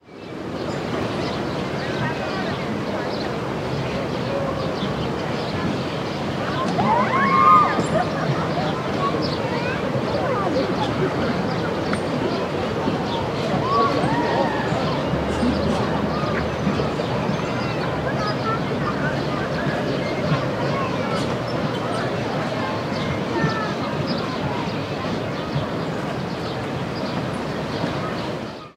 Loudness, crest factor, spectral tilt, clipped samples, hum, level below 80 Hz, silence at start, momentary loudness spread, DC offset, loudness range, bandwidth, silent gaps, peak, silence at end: -23 LUFS; 20 dB; -6.5 dB/octave; under 0.1%; none; -46 dBFS; 0.05 s; 6 LU; under 0.1%; 6 LU; 15.5 kHz; none; -4 dBFS; 0.05 s